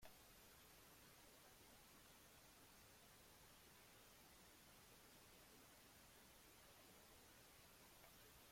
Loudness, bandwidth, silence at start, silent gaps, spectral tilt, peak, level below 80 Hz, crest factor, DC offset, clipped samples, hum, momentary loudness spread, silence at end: -66 LUFS; 16.5 kHz; 0 s; none; -2.5 dB/octave; -48 dBFS; -80 dBFS; 20 dB; under 0.1%; under 0.1%; none; 1 LU; 0 s